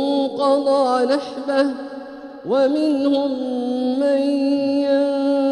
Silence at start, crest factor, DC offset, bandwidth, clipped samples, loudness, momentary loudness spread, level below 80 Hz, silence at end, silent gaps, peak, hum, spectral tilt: 0 s; 16 dB; under 0.1%; 10.5 kHz; under 0.1%; -19 LUFS; 6 LU; -66 dBFS; 0 s; none; -4 dBFS; none; -5 dB/octave